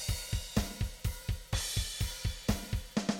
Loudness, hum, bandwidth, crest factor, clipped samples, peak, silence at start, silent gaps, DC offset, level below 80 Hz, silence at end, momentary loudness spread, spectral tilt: -36 LUFS; none; 17 kHz; 20 dB; under 0.1%; -16 dBFS; 0 s; none; under 0.1%; -40 dBFS; 0 s; 4 LU; -4 dB/octave